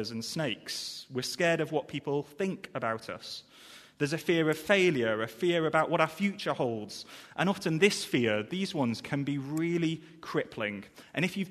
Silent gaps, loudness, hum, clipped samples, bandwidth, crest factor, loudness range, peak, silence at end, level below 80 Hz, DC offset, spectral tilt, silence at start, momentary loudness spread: none; -31 LUFS; none; under 0.1%; 13.5 kHz; 22 dB; 4 LU; -8 dBFS; 0 s; -70 dBFS; under 0.1%; -5 dB/octave; 0 s; 13 LU